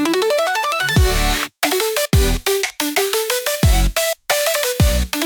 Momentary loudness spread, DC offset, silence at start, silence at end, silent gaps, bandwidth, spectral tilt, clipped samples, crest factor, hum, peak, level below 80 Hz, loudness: 3 LU; under 0.1%; 0 s; 0 s; none; 19.5 kHz; -3.5 dB/octave; under 0.1%; 14 dB; none; -4 dBFS; -22 dBFS; -17 LUFS